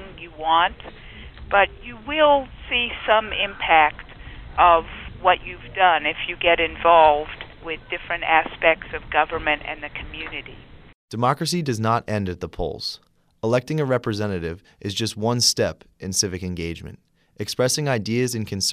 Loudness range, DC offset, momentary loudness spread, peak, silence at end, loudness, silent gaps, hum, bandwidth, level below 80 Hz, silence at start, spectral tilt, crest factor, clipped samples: 6 LU; under 0.1%; 18 LU; -2 dBFS; 0 s; -21 LUFS; 10.94-11.08 s; none; 15.5 kHz; -44 dBFS; 0 s; -3.5 dB/octave; 20 dB; under 0.1%